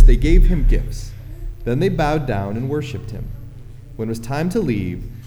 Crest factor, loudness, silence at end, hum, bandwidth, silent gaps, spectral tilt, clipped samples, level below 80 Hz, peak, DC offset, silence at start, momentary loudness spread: 16 dB; -21 LUFS; 0 s; none; 9.8 kHz; none; -7.5 dB/octave; under 0.1%; -18 dBFS; 0 dBFS; under 0.1%; 0 s; 18 LU